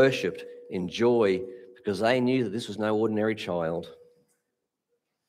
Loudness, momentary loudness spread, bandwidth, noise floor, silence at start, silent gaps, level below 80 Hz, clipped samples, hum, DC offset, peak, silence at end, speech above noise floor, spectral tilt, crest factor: -27 LUFS; 13 LU; 14 kHz; -82 dBFS; 0 s; none; -68 dBFS; under 0.1%; none; under 0.1%; -8 dBFS; 1.35 s; 56 dB; -6 dB/octave; 20 dB